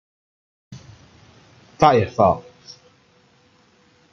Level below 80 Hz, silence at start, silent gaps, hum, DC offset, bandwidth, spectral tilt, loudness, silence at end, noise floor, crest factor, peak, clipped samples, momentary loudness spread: -54 dBFS; 0.7 s; none; none; under 0.1%; 7.8 kHz; -6.5 dB/octave; -18 LUFS; 1.7 s; -57 dBFS; 22 dB; -2 dBFS; under 0.1%; 27 LU